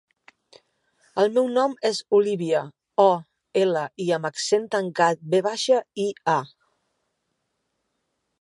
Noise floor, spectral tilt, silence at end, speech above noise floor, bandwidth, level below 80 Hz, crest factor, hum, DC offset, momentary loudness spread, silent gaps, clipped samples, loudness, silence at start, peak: -76 dBFS; -4.5 dB/octave; 1.95 s; 54 dB; 11.5 kHz; -78 dBFS; 20 dB; none; under 0.1%; 7 LU; none; under 0.1%; -23 LUFS; 1.15 s; -4 dBFS